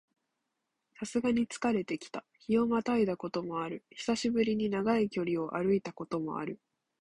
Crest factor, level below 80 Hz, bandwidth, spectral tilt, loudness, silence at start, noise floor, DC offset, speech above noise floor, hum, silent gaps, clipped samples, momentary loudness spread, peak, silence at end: 16 dB; -66 dBFS; 11 kHz; -5.5 dB/octave; -32 LUFS; 1 s; -84 dBFS; under 0.1%; 53 dB; none; none; under 0.1%; 10 LU; -16 dBFS; 0.45 s